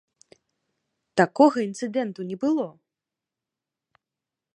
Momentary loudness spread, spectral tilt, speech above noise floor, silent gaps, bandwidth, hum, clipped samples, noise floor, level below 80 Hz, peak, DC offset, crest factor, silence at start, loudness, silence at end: 11 LU; -6 dB/octave; 65 dB; none; 10.5 kHz; none; under 0.1%; -88 dBFS; -74 dBFS; -4 dBFS; under 0.1%; 24 dB; 1.15 s; -24 LUFS; 1.85 s